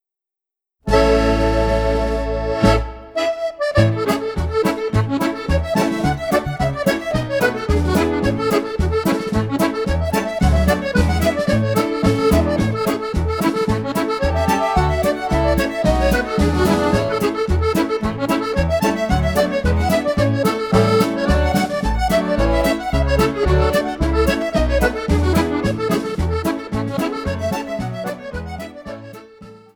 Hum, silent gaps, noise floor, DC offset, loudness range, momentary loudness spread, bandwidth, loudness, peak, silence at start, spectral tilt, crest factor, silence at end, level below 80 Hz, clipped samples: none; none; -87 dBFS; under 0.1%; 2 LU; 6 LU; over 20 kHz; -18 LUFS; -2 dBFS; 0.85 s; -6.5 dB/octave; 16 dB; 0.2 s; -26 dBFS; under 0.1%